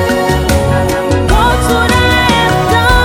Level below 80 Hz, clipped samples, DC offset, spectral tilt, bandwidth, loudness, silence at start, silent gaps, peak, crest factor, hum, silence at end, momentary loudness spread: -18 dBFS; 0.1%; under 0.1%; -5 dB/octave; 19 kHz; -10 LUFS; 0 s; none; 0 dBFS; 10 dB; none; 0 s; 4 LU